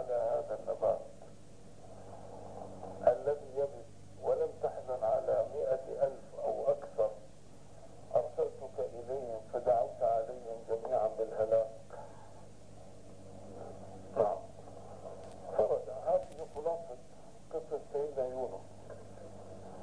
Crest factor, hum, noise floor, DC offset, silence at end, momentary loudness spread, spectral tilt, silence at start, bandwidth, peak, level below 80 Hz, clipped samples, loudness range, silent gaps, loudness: 22 dB; 50 Hz at -60 dBFS; -57 dBFS; 0.3%; 0 s; 22 LU; -6.5 dB/octave; 0 s; 10.5 kHz; -14 dBFS; -66 dBFS; under 0.1%; 6 LU; none; -35 LUFS